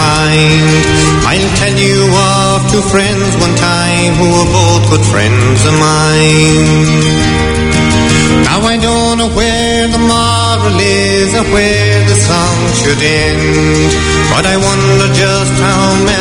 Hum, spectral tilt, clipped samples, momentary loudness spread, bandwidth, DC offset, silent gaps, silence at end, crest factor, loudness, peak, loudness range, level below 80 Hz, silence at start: none; -4.5 dB/octave; 0.4%; 2 LU; 11 kHz; under 0.1%; none; 0 s; 8 dB; -8 LUFS; 0 dBFS; 1 LU; -24 dBFS; 0 s